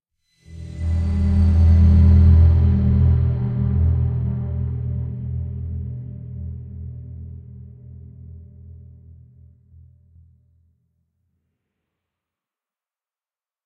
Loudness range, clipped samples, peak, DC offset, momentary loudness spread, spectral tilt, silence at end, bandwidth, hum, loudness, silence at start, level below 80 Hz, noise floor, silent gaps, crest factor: 22 LU; under 0.1%; -4 dBFS; under 0.1%; 24 LU; -10.5 dB/octave; 4.9 s; 2.3 kHz; none; -18 LUFS; 0.5 s; -30 dBFS; under -90 dBFS; none; 16 dB